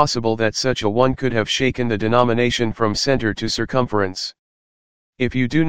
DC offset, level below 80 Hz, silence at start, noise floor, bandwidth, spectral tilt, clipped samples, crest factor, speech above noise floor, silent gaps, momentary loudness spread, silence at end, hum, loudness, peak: 2%; -42 dBFS; 0 s; under -90 dBFS; 16 kHz; -5 dB/octave; under 0.1%; 18 dB; over 71 dB; 4.39-5.13 s; 6 LU; 0 s; none; -19 LUFS; 0 dBFS